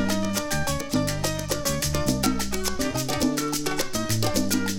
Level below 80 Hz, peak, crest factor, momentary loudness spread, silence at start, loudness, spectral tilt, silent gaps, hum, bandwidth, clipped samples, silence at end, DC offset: -38 dBFS; -6 dBFS; 18 dB; 3 LU; 0 s; -25 LUFS; -4 dB/octave; none; none; 17.5 kHz; under 0.1%; 0 s; under 0.1%